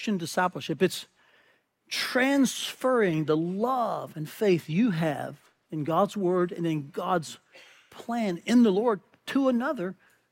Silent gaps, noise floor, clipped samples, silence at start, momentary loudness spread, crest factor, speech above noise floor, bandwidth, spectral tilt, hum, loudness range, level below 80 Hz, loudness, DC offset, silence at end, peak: none; -66 dBFS; under 0.1%; 0 s; 12 LU; 16 dB; 39 dB; 16.5 kHz; -5.5 dB/octave; none; 3 LU; -72 dBFS; -27 LUFS; under 0.1%; 0.4 s; -10 dBFS